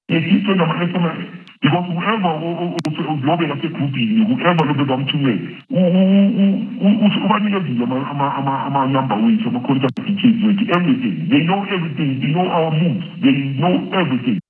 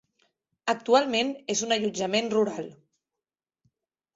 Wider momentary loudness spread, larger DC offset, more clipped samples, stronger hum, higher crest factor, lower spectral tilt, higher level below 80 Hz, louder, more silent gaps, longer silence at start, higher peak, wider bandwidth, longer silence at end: second, 6 LU vs 11 LU; neither; neither; neither; about the same, 16 dB vs 20 dB; first, -8.5 dB/octave vs -3 dB/octave; about the same, -74 dBFS vs -72 dBFS; first, -17 LUFS vs -26 LUFS; neither; second, 0.1 s vs 0.65 s; first, 0 dBFS vs -8 dBFS; second, 6.4 kHz vs 8 kHz; second, 0.1 s vs 1.45 s